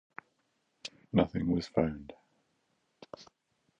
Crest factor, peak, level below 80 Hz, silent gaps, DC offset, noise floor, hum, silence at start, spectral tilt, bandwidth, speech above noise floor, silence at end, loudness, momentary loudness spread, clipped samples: 24 dB; -12 dBFS; -56 dBFS; none; under 0.1%; -77 dBFS; none; 0.85 s; -7.5 dB/octave; 9.8 kHz; 47 dB; 0.55 s; -32 LUFS; 22 LU; under 0.1%